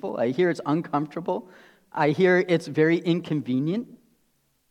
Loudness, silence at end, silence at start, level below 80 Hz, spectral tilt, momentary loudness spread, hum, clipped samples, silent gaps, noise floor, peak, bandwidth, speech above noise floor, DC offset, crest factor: -24 LUFS; 0.75 s; 0.05 s; -74 dBFS; -7.5 dB/octave; 11 LU; none; under 0.1%; none; -69 dBFS; -8 dBFS; 10.5 kHz; 45 dB; under 0.1%; 16 dB